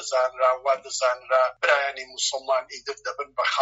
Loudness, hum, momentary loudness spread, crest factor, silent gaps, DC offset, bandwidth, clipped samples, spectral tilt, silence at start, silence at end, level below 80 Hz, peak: -24 LUFS; none; 10 LU; 20 dB; none; under 0.1%; 8 kHz; under 0.1%; 4 dB/octave; 0 s; 0 s; -70 dBFS; -4 dBFS